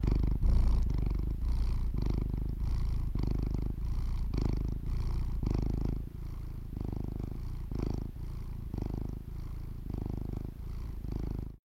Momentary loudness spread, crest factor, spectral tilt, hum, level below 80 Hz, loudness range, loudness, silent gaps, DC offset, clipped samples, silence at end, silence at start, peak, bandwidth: 11 LU; 16 dB; -8.5 dB/octave; none; -34 dBFS; 6 LU; -37 LUFS; none; under 0.1%; under 0.1%; 0.1 s; 0 s; -16 dBFS; 6.4 kHz